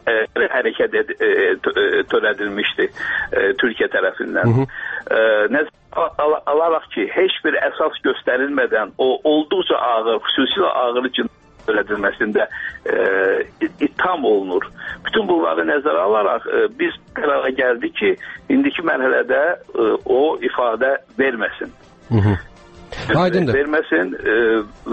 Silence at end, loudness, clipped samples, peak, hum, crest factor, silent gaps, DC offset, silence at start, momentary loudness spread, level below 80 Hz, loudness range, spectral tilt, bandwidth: 0 s; -18 LUFS; under 0.1%; -4 dBFS; none; 14 dB; none; under 0.1%; 0.05 s; 6 LU; -50 dBFS; 2 LU; -7.5 dB/octave; 8 kHz